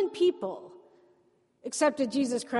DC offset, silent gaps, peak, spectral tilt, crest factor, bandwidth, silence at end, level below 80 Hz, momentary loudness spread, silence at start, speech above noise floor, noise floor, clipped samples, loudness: under 0.1%; none; -14 dBFS; -3.5 dB/octave; 16 dB; 11.5 kHz; 0 s; -76 dBFS; 15 LU; 0 s; 39 dB; -68 dBFS; under 0.1%; -29 LUFS